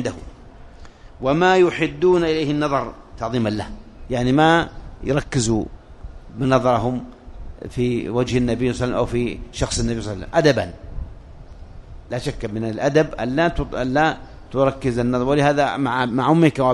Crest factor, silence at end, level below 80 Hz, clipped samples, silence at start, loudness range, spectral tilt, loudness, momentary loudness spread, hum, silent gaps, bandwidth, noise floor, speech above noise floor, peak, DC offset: 20 dB; 0 s; -38 dBFS; under 0.1%; 0 s; 4 LU; -6 dB/octave; -20 LUFS; 15 LU; none; none; 11.5 kHz; -41 dBFS; 22 dB; 0 dBFS; under 0.1%